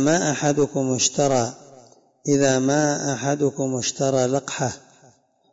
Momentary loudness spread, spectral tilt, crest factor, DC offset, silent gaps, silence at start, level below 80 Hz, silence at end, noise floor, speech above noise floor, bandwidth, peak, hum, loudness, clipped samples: 8 LU; -4 dB/octave; 16 dB; under 0.1%; none; 0 s; -62 dBFS; 0.75 s; -56 dBFS; 35 dB; 8 kHz; -6 dBFS; none; -21 LUFS; under 0.1%